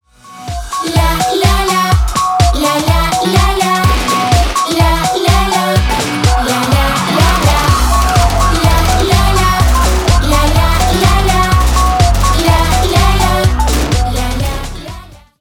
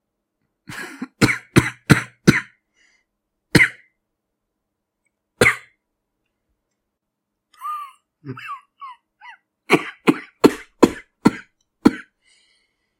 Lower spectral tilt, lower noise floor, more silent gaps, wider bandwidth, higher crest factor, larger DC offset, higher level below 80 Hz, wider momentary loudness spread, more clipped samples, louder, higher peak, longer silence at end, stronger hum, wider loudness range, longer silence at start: about the same, -4.5 dB/octave vs -5.5 dB/octave; second, -31 dBFS vs -79 dBFS; neither; first, 19 kHz vs 16 kHz; second, 10 dB vs 22 dB; neither; first, -16 dBFS vs -48 dBFS; second, 4 LU vs 21 LU; neither; first, -11 LUFS vs -18 LUFS; about the same, 0 dBFS vs 0 dBFS; second, 0.25 s vs 1 s; neither; second, 1 LU vs 17 LU; second, 0.25 s vs 0.7 s